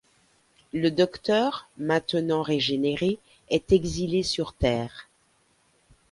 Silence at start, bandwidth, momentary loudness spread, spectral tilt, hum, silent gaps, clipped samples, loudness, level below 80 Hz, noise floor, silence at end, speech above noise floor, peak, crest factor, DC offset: 0.75 s; 11.5 kHz; 9 LU; -5.5 dB/octave; none; none; under 0.1%; -26 LUFS; -46 dBFS; -65 dBFS; 1.1 s; 40 dB; -8 dBFS; 20 dB; under 0.1%